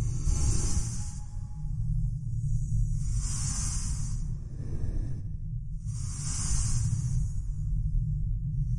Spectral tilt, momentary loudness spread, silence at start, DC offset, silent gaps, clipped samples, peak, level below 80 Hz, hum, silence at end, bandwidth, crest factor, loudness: -5 dB/octave; 8 LU; 0 s; under 0.1%; none; under 0.1%; -14 dBFS; -32 dBFS; none; 0 s; 11.5 kHz; 16 dB; -33 LUFS